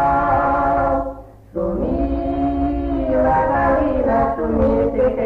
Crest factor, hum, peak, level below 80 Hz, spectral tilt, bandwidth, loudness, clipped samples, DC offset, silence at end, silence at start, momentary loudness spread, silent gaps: 12 dB; none; -6 dBFS; -30 dBFS; -10 dB/octave; 5.2 kHz; -18 LUFS; under 0.1%; under 0.1%; 0 s; 0 s; 7 LU; none